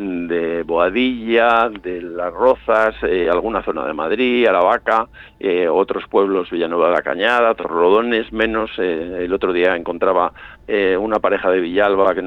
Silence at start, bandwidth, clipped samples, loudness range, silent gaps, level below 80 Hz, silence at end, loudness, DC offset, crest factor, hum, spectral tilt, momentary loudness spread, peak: 0 s; 7.2 kHz; under 0.1%; 1 LU; none; -46 dBFS; 0 s; -17 LUFS; under 0.1%; 14 dB; none; -6.5 dB/octave; 7 LU; -2 dBFS